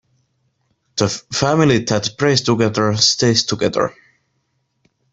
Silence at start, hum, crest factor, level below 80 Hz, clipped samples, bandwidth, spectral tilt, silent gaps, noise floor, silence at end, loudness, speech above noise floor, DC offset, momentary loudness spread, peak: 0.95 s; none; 18 dB; -52 dBFS; under 0.1%; 8.4 kHz; -4 dB/octave; none; -68 dBFS; 1.25 s; -16 LUFS; 52 dB; under 0.1%; 7 LU; 0 dBFS